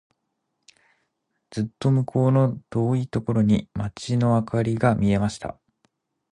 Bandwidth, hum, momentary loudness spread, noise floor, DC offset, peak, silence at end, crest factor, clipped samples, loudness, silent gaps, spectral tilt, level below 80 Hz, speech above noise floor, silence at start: 10.5 kHz; none; 10 LU; -77 dBFS; under 0.1%; -4 dBFS; 0.8 s; 18 dB; under 0.1%; -23 LUFS; none; -8 dB/octave; -50 dBFS; 55 dB; 1.5 s